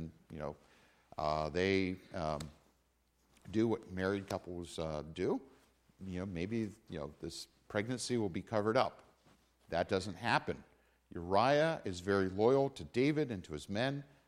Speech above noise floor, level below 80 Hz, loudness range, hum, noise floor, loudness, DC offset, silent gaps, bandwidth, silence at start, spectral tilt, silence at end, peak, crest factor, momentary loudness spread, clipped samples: 39 dB; -62 dBFS; 7 LU; none; -75 dBFS; -36 LUFS; under 0.1%; none; 15 kHz; 0 s; -5.5 dB/octave; 0.2 s; -16 dBFS; 20 dB; 15 LU; under 0.1%